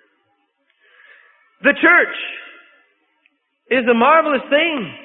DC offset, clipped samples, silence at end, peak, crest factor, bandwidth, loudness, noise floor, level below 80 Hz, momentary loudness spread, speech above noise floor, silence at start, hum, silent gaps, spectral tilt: under 0.1%; under 0.1%; 0.05 s; 0 dBFS; 18 dB; 4.1 kHz; -15 LUFS; -65 dBFS; -70 dBFS; 13 LU; 50 dB; 1.65 s; none; none; -9 dB/octave